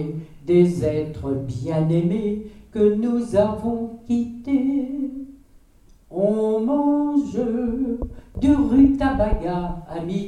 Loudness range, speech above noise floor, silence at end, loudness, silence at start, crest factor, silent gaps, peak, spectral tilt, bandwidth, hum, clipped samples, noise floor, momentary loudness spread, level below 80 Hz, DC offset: 4 LU; 31 dB; 0 s; -21 LUFS; 0 s; 16 dB; none; -4 dBFS; -8.5 dB/octave; 10.5 kHz; none; under 0.1%; -52 dBFS; 13 LU; -36 dBFS; under 0.1%